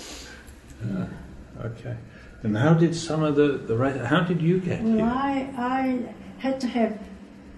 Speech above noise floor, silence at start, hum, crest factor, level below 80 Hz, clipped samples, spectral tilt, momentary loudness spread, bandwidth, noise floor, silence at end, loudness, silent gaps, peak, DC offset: 20 dB; 0 s; none; 18 dB; -50 dBFS; under 0.1%; -7 dB/octave; 19 LU; 11.5 kHz; -44 dBFS; 0 s; -24 LUFS; none; -6 dBFS; under 0.1%